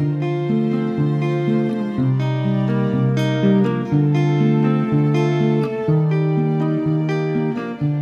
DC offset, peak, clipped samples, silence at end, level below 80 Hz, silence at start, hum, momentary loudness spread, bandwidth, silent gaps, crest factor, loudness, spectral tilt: under 0.1%; -6 dBFS; under 0.1%; 0 s; -56 dBFS; 0 s; none; 4 LU; 6.8 kHz; none; 12 dB; -19 LUFS; -9 dB/octave